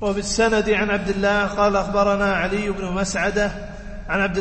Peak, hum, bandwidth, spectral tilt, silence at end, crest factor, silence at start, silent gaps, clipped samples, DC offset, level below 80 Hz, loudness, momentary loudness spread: -6 dBFS; none; 8.8 kHz; -4.5 dB/octave; 0 s; 16 dB; 0 s; none; under 0.1%; under 0.1%; -36 dBFS; -20 LUFS; 7 LU